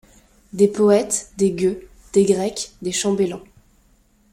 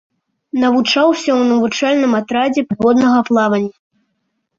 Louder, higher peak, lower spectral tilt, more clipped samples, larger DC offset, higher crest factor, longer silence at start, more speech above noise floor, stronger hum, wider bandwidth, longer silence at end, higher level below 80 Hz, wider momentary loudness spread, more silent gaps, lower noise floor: second, -20 LUFS vs -14 LUFS; about the same, -2 dBFS vs -2 dBFS; about the same, -5 dB/octave vs -5 dB/octave; neither; neither; first, 18 dB vs 12 dB; about the same, 0.55 s vs 0.55 s; second, 39 dB vs 56 dB; neither; first, 15.5 kHz vs 7.6 kHz; about the same, 0.95 s vs 0.85 s; about the same, -52 dBFS vs -56 dBFS; first, 11 LU vs 5 LU; neither; second, -57 dBFS vs -69 dBFS